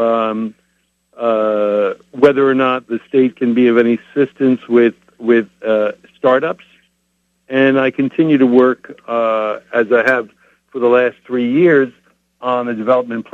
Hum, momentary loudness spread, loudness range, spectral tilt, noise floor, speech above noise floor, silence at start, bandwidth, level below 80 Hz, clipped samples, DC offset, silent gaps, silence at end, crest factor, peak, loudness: none; 10 LU; 2 LU; -7.5 dB/octave; -65 dBFS; 51 dB; 0 s; 7 kHz; -64 dBFS; under 0.1%; under 0.1%; none; 0.1 s; 14 dB; 0 dBFS; -15 LUFS